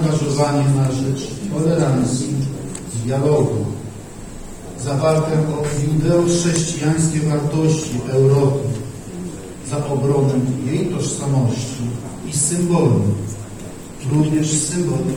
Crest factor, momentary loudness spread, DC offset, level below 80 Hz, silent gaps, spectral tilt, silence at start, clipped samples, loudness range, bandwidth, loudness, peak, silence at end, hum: 18 dB; 14 LU; under 0.1%; -42 dBFS; none; -6 dB/octave; 0 s; under 0.1%; 3 LU; 17.5 kHz; -18 LUFS; 0 dBFS; 0 s; none